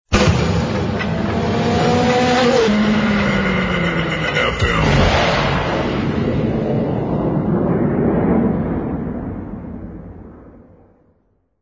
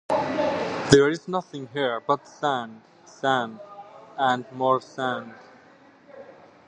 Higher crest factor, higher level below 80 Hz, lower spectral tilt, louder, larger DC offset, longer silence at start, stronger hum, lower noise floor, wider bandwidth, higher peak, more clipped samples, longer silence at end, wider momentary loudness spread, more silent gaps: second, 16 dB vs 26 dB; first, -30 dBFS vs -54 dBFS; about the same, -6 dB/octave vs -5 dB/octave; first, -17 LUFS vs -25 LUFS; neither; about the same, 0.1 s vs 0.1 s; neither; first, -61 dBFS vs -53 dBFS; second, 7.6 kHz vs 11 kHz; about the same, 0 dBFS vs 0 dBFS; neither; first, 1.05 s vs 0.35 s; second, 11 LU vs 22 LU; neither